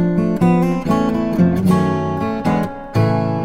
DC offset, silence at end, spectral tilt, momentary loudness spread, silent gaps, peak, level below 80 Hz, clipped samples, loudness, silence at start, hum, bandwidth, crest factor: under 0.1%; 0 s; -8.5 dB/octave; 5 LU; none; -2 dBFS; -40 dBFS; under 0.1%; -17 LUFS; 0 s; none; 14 kHz; 14 dB